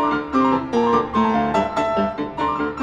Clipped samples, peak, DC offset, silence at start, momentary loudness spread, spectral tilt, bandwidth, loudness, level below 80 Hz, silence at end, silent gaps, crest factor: under 0.1%; -6 dBFS; under 0.1%; 0 s; 4 LU; -6.5 dB/octave; 9 kHz; -20 LUFS; -44 dBFS; 0 s; none; 14 dB